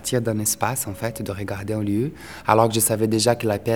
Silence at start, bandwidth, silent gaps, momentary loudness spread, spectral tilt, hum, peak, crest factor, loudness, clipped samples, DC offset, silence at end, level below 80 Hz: 0 s; 19.5 kHz; none; 11 LU; -4.5 dB/octave; none; 0 dBFS; 22 dB; -22 LUFS; under 0.1%; 0.3%; 0 s; -52 dBFS